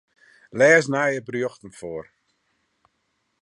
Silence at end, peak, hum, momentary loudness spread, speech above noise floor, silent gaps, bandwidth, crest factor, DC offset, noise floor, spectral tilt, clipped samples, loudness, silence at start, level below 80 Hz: 1.4 s; -4 dBFS; none; 21 LU; 52 dB; none; 11 kHz; 20 dB; under 0.1%; -73 dBFS; -5 dB/octave; under 0.1%; -20 LUFS; 0.55 s; -66 dBFS